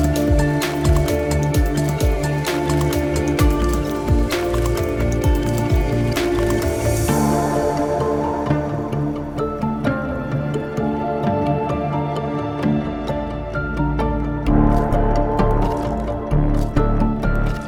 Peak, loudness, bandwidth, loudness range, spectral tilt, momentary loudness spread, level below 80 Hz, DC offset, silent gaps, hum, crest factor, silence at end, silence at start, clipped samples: -2 dBFS; -20 LUFS; over 20 kHz; 3 LU; -6.5 dB/octave; 6 LU; -24 dBFS; under 0.1%; none; none; 18 dB; 0 s; 0 s; under 0.1%